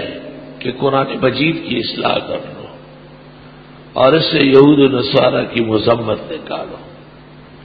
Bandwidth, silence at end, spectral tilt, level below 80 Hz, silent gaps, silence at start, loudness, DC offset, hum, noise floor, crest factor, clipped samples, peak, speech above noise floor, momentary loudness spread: 5 kHz; 0 s; -8.5 dB/octave; -48 dBFS; none; 0 s; -14 LUFS; under 0.1%; none; -39 dBFS; 16 dB; under 0.1%; 0 dBFS; 25 dB; 21 LU